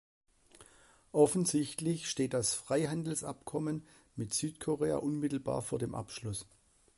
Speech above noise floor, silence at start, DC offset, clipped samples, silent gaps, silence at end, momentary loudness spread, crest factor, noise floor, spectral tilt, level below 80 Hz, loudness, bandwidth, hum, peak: 29 dB; 0.6 s; under 0.1%; under 0.1%; none; 0.55 s; 12 LU; 22 dB; -63 dBFS; -5 dB/octave; -64 dBFS; -34 LUFS; 12 kHz; none; -14 dBFS